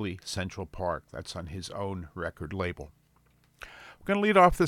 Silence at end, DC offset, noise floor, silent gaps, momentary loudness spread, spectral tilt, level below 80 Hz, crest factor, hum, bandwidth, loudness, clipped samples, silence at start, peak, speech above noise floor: 0 s; under 0.1%; -65 dBFS; none; 23 LU; -5.5 dB/octave; -48 dBFS; 22 dB; 60 Hz at -65 dBFS; 17 kHz; -30 LUFS; under 0.1%; 0 s; -8 dBFS; 36 dB